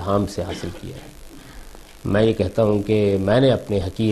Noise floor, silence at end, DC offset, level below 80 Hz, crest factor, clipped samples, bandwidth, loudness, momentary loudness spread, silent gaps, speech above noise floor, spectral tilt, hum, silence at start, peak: -39 dBFS; 0 s; under 0.1%; -42 dBFS; 16 dB; under 0.1%; 13.5 kHz; -20 LUFS; 16 LU; none; 20 dB; -7 dB/octave; none; 0 s; -6 dBFS